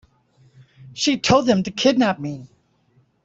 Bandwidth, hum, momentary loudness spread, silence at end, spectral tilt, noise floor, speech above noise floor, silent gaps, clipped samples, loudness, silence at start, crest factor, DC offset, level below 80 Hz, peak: 8 kHz; none; 17 LU; 0.8 s; -4.5 dB/octave; -61 dBFS; 42 dB; none; under 0.1%; -19 LUFS; 0.8 s; 20 dB; under 0.1%; -54 dBFS; -2 dBFS